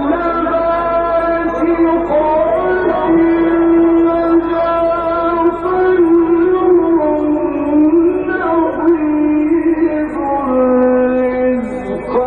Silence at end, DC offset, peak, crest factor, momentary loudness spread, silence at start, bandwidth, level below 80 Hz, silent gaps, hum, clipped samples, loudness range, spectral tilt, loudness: 0 s; under 0.1%; -2 dBFS; 10 dB; 5 LU; 0 s; 4.5 kHz; -38 dBFS; none; 50 Hz at -35 dBFS; under 0.1%; 1 LU; -9 dB/octave; -13 LUFS